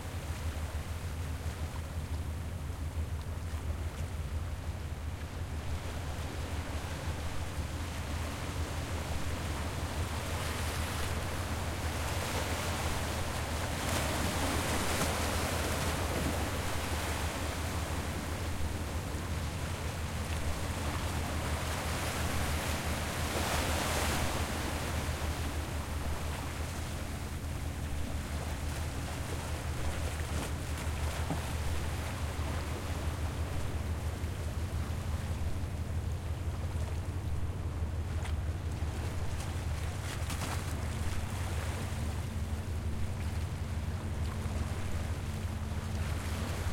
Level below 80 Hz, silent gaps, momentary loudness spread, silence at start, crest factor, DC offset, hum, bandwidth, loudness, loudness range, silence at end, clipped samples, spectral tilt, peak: -42 dBFS; none; 6 LU; 0 s; 16 dB; under 0.1%; none; 16.5 kHz; -36 LUFS; 6 LU; 0 s; under 0.1%; -4.5 dB/octave; -18 dBFS